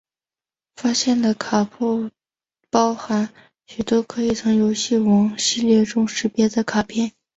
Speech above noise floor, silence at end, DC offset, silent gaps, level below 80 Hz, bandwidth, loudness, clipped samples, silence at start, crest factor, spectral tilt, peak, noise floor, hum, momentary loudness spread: over 71 dB; 0.25 s; under 0.1%; none; -56 dBFS; 8.2 kHz; -20 LUFS; under 0.1%; 0.8 s; 18 dB; -4.5 dB/octave; -4 dBFS; under -90 dBFS; none; 8 LU